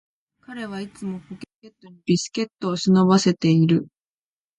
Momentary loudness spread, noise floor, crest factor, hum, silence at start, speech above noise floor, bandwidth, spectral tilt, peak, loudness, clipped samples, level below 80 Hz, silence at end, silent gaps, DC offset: 21 LU; under -90 dBFS; 18 dB; none; 0.5 s; over 69 dB; 10.5 kHz; -6 dB/octave; -4 dBFS; -20 LUFS; under 0.1%; -62 dBFS; 0.75 s; 1.55-1.60 s; under 0.1%